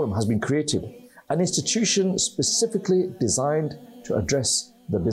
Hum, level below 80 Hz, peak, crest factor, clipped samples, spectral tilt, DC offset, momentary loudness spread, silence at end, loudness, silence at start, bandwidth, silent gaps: none; -54 dBFS; -12 dBFS; 12 dB; under 0.1%; -4 dB/octave; under 0.1%; 8 LU; 0 s; -23 LUFS; 0 s; 15 kHz; none